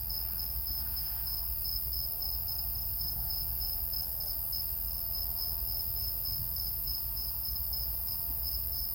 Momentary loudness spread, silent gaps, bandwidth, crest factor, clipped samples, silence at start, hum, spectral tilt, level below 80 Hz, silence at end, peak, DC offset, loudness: 1 LU; none; 17 kHz; 16 dB; under 0.1%; 0 s; none; -2.5 dB/octave; -44 dBFS; 0 s; -18 dBFS; under 0.1%; -32 LUFS